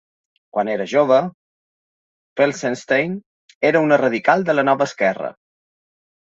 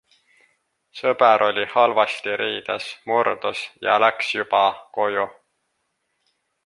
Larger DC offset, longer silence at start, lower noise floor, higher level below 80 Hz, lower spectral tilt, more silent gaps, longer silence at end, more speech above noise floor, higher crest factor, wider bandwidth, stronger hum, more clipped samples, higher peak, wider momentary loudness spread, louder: neither; second, 0.55 s vs 0.95 s; first, under -90 dBFS vs -73 dBFS; about the same, -68 dBFS vs -70 dBFS; first, -5.5 dB/octave vs -3.5 dB/octave; first, 1.34-2.36 s, 3.26-3.49 s, 3.55-3.61 s vs none; second, 1 s vs 1.35 s; first, over 73 dB vs 53 dB; about the same, 18 dB vs 20 dB; second, 8 kHz vs 11.5 kHz; neither; neither; about the same, -2 dBFS vs -2 dBFS; first, 13 LU vs 10 LU; first, -18 LUFS vs -21 LUFS